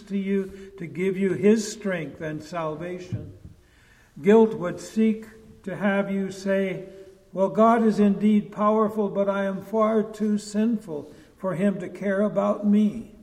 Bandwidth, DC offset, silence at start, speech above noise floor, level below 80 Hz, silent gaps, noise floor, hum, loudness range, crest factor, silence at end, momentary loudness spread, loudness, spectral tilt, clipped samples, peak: 11 kHz; under 0.1%; 0 s; 32 dB; -58 dBFS; none; -56 dBFS; none; 5 LU; 18 dB; 0.15 s; 16 LU; -24 LUFS; -7 dB/octave; under 0.1%; -6 dBFS